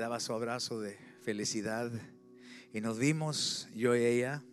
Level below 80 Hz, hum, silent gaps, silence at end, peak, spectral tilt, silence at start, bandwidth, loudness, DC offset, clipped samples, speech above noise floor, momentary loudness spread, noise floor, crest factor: -80 dBFS; none; none; 0 s; -18 dBFS; -4 dB/octave; 0 s; 14.5 kHz; -34 LUFS; under 0.1%; under 0.1%; 20 dB; 15 LU; -54 dBFS; 18 dB